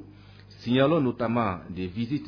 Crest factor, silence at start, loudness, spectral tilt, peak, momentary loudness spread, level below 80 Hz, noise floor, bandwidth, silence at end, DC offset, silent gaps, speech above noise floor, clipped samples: 16 dB; 0 s; -26 LUFS; -8.5 dB/octave; -10 dBFS; 12 LU; -56 dBFS; -49 dBFS; 5.4 kHz; 0 s; under 0.1%; none; 23 dB; under 0.1%